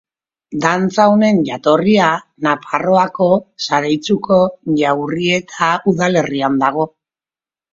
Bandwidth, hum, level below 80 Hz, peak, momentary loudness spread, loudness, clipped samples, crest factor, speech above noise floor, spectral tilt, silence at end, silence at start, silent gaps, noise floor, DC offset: 7.6 kHz; none; -56 dBFS; 0 dBFS; 6 LU; -15 LUFS; under 0.1%; 16 dB; over 76 dB; -5.5 dB/octave; 0.85 s; 0.5 s; none; under -90 dBFS; under 0.1%